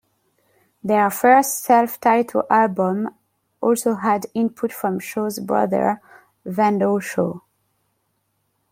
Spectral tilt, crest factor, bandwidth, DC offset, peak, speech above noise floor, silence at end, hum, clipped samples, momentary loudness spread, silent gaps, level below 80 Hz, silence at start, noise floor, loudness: -5.5 dB/octave; 18 dB; 16.5 kHz; under 0.1%; -2 dBFS; 51 dB; 1.35 s; none; under 0.1%; 10 LU; none; -66 dBFS; 0.85 s; -70 dBFS; -20 LUFS